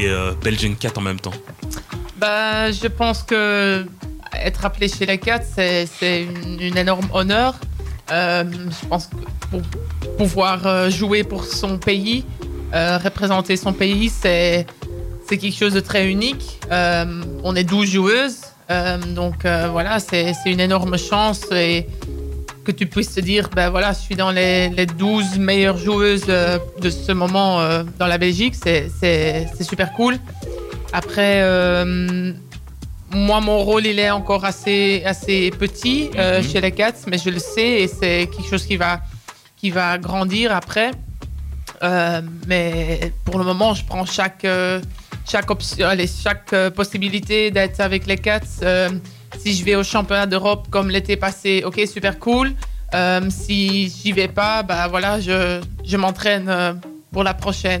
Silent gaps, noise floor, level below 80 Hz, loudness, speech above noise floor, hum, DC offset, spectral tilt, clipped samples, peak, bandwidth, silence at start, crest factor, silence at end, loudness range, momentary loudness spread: none; -39 dBFS; -32 dBFS; -18 LUFS; 21 dB; none; under 0.1%; -5 dB/octave; under 0.1%; -8 dBFS; 16 kHz; 0 s; 12 dB; 0 s; 3 LU; 11 LU